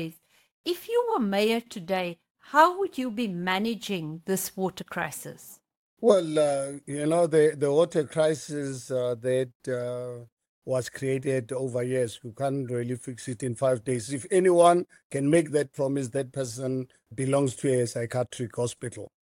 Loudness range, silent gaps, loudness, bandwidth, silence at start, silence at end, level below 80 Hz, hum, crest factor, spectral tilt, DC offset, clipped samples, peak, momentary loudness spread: 6 LU; 0.51-0.64 s, 2.31-2.35 s, 5.77-5.97 s, 9.55-9.60 s, 10.32-10.37 s, 10.49-10.62 s, 15.04-15.10 s; -27 LUFS; 17 kHz; 0 s; 0.15 s; -68 dBFS; none; 22 dB; -5.5 dB/octave; under 0.1%; under 0.1%; -6 dBFS; 12 LU